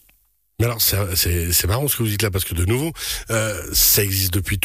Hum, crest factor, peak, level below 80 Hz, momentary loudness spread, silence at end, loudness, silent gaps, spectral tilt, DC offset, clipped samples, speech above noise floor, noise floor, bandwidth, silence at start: none; 16 dB; -4 dBFS; -34 dBFS; 9 LU; 0 s; -18 LUFS; none; -3.5 dB/octave; under 0.1%; under 0.1%; 41 dB; -61 dBFS; 15.5 kHz; 0.6 s